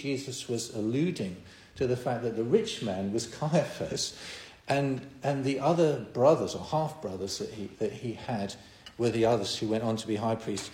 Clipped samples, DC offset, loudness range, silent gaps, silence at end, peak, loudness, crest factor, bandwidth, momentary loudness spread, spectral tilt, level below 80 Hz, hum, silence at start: under 0.1%; under 0.1%; 3 LU; none; 0 s; -8 dBFS; -30 LUFS; 22 dB; 16 kHz; 12 LU; -5.5 dB/octave; -62 dBFS; none; 0 s